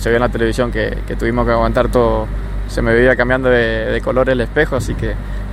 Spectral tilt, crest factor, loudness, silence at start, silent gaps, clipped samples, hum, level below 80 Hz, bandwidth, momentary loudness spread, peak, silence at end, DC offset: -6.5 dB/octave; 14 dB; -16 LUFS; 0 s; none; under 0.1%; none; -22 dBFS; 13 kHz; 9 LU; 0 dBFS; 0 s; under 0.1%